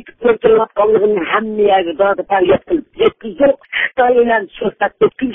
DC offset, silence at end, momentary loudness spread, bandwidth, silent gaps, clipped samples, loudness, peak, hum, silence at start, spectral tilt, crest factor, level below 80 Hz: under 0.1%; 0 s; 5 LU; 3.8 kHz; none; under 0.1%; -14 LUFS; 0 dBFS; none; 0.05 s; -9 dB/octave; 14 dB; -48 dBFS